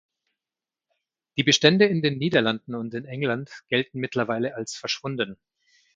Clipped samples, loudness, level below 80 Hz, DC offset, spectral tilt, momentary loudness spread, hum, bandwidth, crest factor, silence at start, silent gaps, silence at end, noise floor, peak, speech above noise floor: under 0.1%; -24 LUFS; -66 dBFS; under 0.1%; -4.5 dB/octave; 14 LU; none; 9.2 kHz; 24 dB; 1.35 s; none; 0.6 s; under -90 dBFS; -2 dBFS; over 66 dB